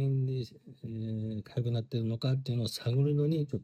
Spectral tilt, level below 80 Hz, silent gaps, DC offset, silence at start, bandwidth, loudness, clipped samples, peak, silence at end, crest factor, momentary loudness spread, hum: -7.5 dB/octave; -68 dBFS; none; under 0.1%; 0 s; 14.5 kHz; -33 LUFS; under 0.1%; -18 dBFS; 0 s; 12 dB; 10 LU; none